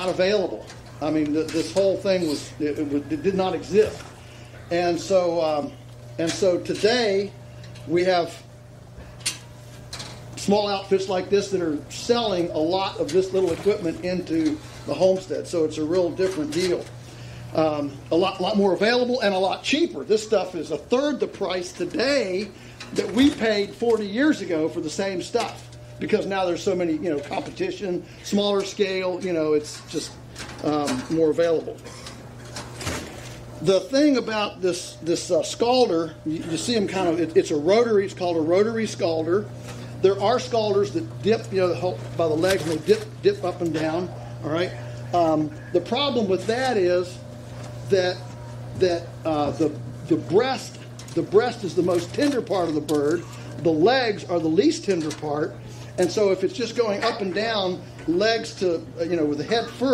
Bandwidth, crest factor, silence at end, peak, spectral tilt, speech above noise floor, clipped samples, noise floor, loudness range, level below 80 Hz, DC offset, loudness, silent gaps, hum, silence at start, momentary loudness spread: 15 kHz; 18 dB; 0 s; -6 dBFS; -5 dB/octave; 21 dB; under 0.1%; -44 dBFS; 3 LU; -52 dBFS; under 0.1%; -23 LUFS; none; none; 0 s; 15 LU